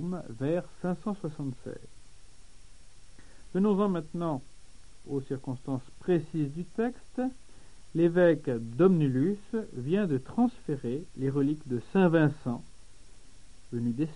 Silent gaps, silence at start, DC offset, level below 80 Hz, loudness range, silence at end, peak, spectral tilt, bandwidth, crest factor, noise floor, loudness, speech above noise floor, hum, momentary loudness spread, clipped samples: none; 0 s; 0.5%; -54 dBFS; 6 LU; 0 s; -10 dBFS; -8.5 dB/octave; 10.5 kHz; 20 dB; -53 dBFS; -30 LUFS; 25 dB; none; 13 LU; under 0.1%